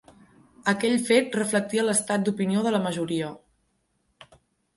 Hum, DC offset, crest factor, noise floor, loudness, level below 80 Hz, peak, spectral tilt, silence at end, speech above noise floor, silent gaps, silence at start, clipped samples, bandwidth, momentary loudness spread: none; under 0.1%; 20 dB; -72 dBFS; -24 LUFS; -68 dBFS; -6 dBFS; -4 dB/octave; 0.5 s; 48 dB; none; 0.65 s; under 0.1%; 11.5 kHz; 8 LU